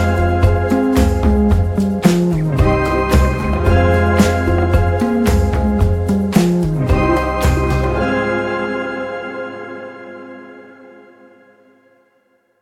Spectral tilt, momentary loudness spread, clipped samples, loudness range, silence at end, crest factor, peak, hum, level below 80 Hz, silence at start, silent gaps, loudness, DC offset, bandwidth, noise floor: -7 dB/octave; 13 LU; under 0.1%; 13 LU; 1.75 s; 14 dB; 0 dBFS; none; -22 dBFS; 0 s; none; -15 LUFS; under 0.1%; 15.5 kHz; -59 dBFS